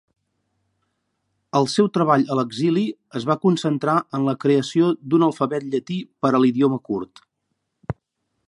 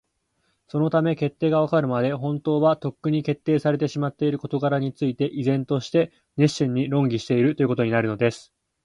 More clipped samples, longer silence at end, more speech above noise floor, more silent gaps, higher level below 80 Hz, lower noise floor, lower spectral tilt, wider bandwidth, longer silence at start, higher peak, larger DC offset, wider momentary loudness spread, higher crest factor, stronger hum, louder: neither; about the same, 0.55 s vs 0.45 s; first, 56 dB vs 49 dB; neither; about the same, -58 dBFS vs -62 dBFS; first, -76 dBFS vs -71 dBFS; about the same, -6.5 dB/octave vs -7.5 dB/octave; about the same, 11.5 kHz vs 11 kHz; first, 1.55 s vs 0.75 s; first, -2 dBFS vs -6 dBFS; neither; first, 12 LU vs 5 LU; about the same, 18 dB vs 16 dB; neither; about the same, -21 LUFS vs -23 LUFS